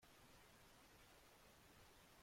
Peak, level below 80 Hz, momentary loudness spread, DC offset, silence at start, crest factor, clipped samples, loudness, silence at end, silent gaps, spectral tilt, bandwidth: -56 dBFS; -78 dBFS; 0 LU; under 0.1%; 0 s; 12 dB; under 0.1%; -68 LUFS; 0 s; none; -3 dB/octave; 16.5 kHz